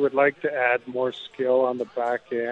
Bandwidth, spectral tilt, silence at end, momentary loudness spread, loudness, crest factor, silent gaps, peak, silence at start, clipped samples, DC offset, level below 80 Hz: 7.8 kHz; -6.5 dB/octave; 0 s; 6 LU; -24 LUFS; 16 dB; none; -8 dBFS; 0 s; under 0.1%; under 0.1%; -72 dBFS